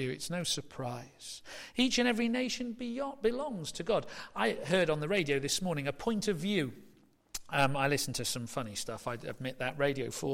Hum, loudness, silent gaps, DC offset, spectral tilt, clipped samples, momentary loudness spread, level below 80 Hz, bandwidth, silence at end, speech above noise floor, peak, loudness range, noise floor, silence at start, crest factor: none; -33 LUFS; none; under 0.1%; -4 dB/octave; under 0.1%; 11 LU; -58 dBFS; 16.5 kHz; 0 s; 24 dB; -16 dBFS; 2 LU; -58 dBFS; 0 s; 18 dB